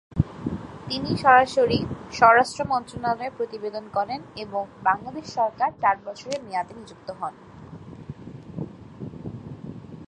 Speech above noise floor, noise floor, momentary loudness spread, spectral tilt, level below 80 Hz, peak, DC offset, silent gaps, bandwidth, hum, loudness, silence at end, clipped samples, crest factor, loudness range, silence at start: 18 dB; -42 dBFS; 23 LU; -5.5 dB/octave; -48 dBFS; -2 dBFS; under 0.1%; none; 11 kHz; none; -24 LUFS; 0 s; under 0.1%; 24 dB; 14 LU; 0.15 s